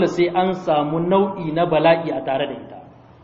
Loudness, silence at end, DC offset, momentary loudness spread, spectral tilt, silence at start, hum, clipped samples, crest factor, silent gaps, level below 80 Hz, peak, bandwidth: -19 LUFS; 0.4 s; under 0.1%; 9 LU; -7 dB/octave; 0 s; none; under 0.1%; 18 dB; none; -54 dBFS; -2 dBFS; 7.6 kHz